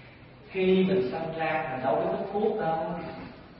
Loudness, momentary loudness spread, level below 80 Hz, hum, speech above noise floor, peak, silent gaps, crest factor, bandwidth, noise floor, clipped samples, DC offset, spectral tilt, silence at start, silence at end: -28 LUFS; 13 LU; -58 dBFS; none; 22 dB; -12 dBFS; none; 16 dB; 5.6 kHz; -49 dBFS; under 0.1%; under 0.1%; -11 dB/octave; 0 s; 0 s